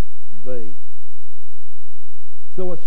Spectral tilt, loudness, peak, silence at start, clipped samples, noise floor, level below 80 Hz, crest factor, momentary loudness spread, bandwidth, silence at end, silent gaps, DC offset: -10.5 dB/octave; -35 LUFS; -4 dBFS; 0.3 s; under 0.1%; -58 dBFS; -60 dBFS; 20 dB; 23 LU; 11 kHz; 0 s; none; 50%